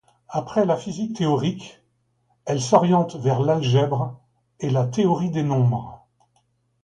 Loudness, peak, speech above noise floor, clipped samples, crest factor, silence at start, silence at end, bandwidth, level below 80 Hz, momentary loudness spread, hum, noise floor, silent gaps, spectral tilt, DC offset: -22 LUFS; -2 dBFS; 47 dB; under 0.1%; 20 dB; 0.3 s; 0.9 s; 9.4 kHz; -58 dBFS; 12 LU; none; -67 dBFS; none; -7 dB/octave; under 0.1%